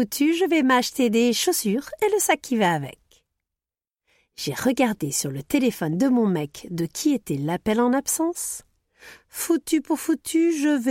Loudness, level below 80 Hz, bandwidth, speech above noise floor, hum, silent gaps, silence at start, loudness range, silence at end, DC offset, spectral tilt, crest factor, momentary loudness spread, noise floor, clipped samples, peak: -23 LUFS; -60 dBFS; 16.5 kHz; over 68 dB; none; none; 0 s; 4 LU; 0 s; under 0.1%; -4 dB/octave; 16 dB; 9 LU; under -90 dBFS; under 0.1%; -8 dBFS